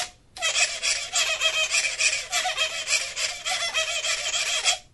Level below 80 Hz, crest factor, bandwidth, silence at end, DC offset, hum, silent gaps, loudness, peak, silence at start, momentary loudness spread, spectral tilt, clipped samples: -58 dBFS; 20 dB; 11.5 kHz; 0.1 s; under 0.1%; none; none; -23 LUFS; -6 dBFS; 0 s; 4 LU; 3 dB/octave; under 0.1%